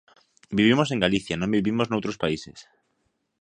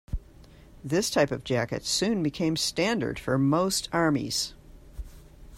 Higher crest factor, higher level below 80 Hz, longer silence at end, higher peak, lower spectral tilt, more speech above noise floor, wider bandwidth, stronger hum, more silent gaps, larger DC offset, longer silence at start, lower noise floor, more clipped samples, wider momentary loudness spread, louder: about the same, 22 dB vs 18 dB; second, -54 dBFS vs -46 dBFS; first, 0.8 s vs 0 s; first, -4 dBFS vs -10 dBFS; first, -5.5 dB/octave vs -4 dB/octave; first, 50 dB vs 25 dB; second, 10 kHz vs 16 kHz; neither; neither; neither; first, 0.5 s vs 0.1 s; first, -73 dBFS vs -51 dBFS; neither; second, 10 LU vs 18 LU; about the same, -24 LUFS vs -26 LUFS